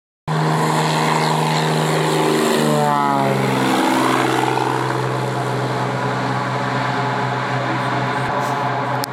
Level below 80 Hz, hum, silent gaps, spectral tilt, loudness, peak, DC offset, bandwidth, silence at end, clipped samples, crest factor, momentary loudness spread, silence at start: -58 dBFS; none; none; -5 dB/octave; -18 LUFS; -2 dBFS; under 0.1%; 16.5 kHz; 0 s; under 0.1%; 16 dB; 4 LU; 0.25 s